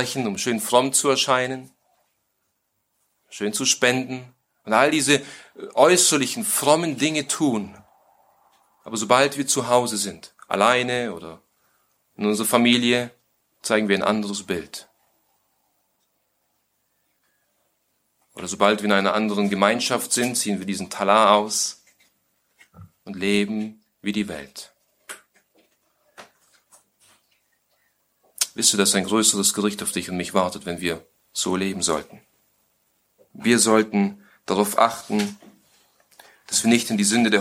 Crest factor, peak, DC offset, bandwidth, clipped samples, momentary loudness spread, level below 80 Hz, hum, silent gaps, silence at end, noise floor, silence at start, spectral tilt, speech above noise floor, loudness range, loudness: 22 dB; -2 dBFS; under 0.1%; 16.5 kHz; under 0.1%; 17 LU; -64 dBFS; 50 Hz at -70 dBFS; none; 0 s; -73 dBFS; 0 s; -3 dB/octave; 52 dB; 9 LU; -21 LUFS